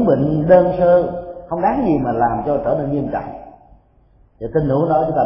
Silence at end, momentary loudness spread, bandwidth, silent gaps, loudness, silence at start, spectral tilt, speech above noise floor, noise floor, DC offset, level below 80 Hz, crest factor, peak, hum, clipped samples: 0 s; 14 LU; 5.6 kHz; none; -17 LUFS; 0 s; -13.5 dB/octave; 36 dB; -52 dBFS; under 0.1%; -40 dBFS; 16 dB; 0 dBFS; none; under 0.1%